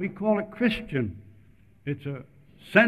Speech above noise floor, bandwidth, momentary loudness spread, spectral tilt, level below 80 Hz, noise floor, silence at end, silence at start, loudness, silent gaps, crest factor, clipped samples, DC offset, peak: 28 dB; 13 kHz; 15 LU; -7.5 dB/octave; -54 dBFS; -57 dBFS; 0 s; 0 s; -28 LUFS; none; 22 dB; under 0.1%; under 0.1%; -4 dBFS